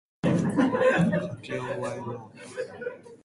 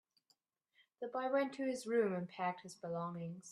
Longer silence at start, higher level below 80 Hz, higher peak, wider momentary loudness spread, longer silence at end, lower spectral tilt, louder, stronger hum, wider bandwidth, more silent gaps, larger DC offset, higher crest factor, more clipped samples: second, 0.25 s vs 1 s; first, -60 dBFS vs -88 dBFS; first, -12 dBFS vs -24 dBFS; first, 16 LU vs 10 LU; about the same, 0.1 s vs 0 s; about the same, -7 dB/octave vs -6 dB/octave; first, -27 LUFS vs -40 LUFS; neither; second, 11.5 kHz vs 13 kHz; neither; neither; about the same, 16 dB vs 18 dB; neither